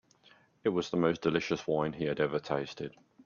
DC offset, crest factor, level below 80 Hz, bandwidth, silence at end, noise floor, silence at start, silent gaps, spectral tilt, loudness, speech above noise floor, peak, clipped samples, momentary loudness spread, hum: under 0.1%; 20 dB; -66 dBFS; 7.2 kHz; 0.35 s; -63 dBFS; 0.65 s; none; -6 dB/octave; -32 LUFS; 32 dB; -14 dBFS; under 0.1%; 9 LU; none